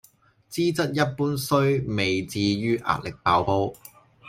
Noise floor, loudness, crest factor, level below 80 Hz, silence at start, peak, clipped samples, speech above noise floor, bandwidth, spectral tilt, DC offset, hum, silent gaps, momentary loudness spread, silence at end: -55 dBFS; -24 LUFS; 18 dB; -54 dBFS; 0.5 s; -6 dBFS; under 0.1%; 32 dB; 16.5 kHz; -5.5 dB/octave; under 0.1%; none; none; 5 LU; 0 s